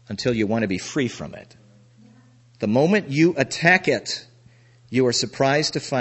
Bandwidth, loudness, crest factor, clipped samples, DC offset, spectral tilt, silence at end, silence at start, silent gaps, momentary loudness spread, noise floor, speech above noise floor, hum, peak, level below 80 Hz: 8.4 kHz; -21 LUFS; 22 dB; under 0.1%; under 0.1%; -4.5 dB/octave; 0 s; 0.1 s; none; 12 LU; -53 dBFS; 32 dB; none; 0 dBFS; -58 dBFS